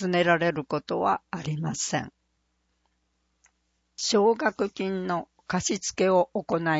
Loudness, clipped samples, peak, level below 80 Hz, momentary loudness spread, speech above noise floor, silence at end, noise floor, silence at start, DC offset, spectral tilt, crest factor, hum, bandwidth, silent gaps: -26 LUFS; under 0.1%; -8 dBFS; -62 dBFS; 9 LU; 48 dB; 0 s; -74 dBFS; 0 s; under 0.1%; -4 dB/octave; 20 dB; none; 8 kHz; none